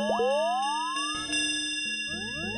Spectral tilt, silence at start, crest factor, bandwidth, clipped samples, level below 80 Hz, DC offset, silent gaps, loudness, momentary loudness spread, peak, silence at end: -1.5 dB/octave; 0 s; 12 dB; 11.5 kHz; under 0.1%; -60 dBFS; under 0.1%; none; -28 LUFS; 5 LU; -16 dBFS; 0 s